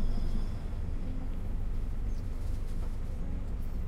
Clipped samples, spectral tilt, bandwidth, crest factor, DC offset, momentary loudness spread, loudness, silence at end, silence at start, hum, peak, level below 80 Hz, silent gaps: under 0.1%; -7.5 dB/octave; 5.8 kHz; 12 dB; under 0.1%; 2 LU; -39 LUFS; 0 s; 0 s; none; -20 dBFS; -32 dBFS; none